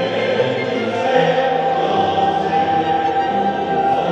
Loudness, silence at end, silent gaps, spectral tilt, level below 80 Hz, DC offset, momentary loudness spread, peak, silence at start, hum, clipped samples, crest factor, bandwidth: -17 LUFS; 0 s; none; -6 dB/octave; -52 dBFS; under 0.1%; 3 LU; -2 dBFS; 0 s; none; under 0.1%; 16 dB; 8.2 kHz